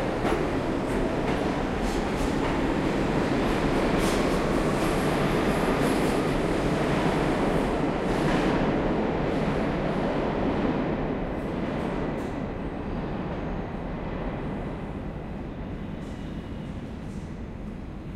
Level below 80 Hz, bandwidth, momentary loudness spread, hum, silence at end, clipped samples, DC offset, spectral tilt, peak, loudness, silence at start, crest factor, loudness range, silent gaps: -38 dBFS; 15.5 kHz; 12 LU; none; 0 s; under 0.1%; under 0.1%; -6.5 dB/octave; -12 dBFS; -27 LUFS; 0 s; 16 dB; 10 LU; none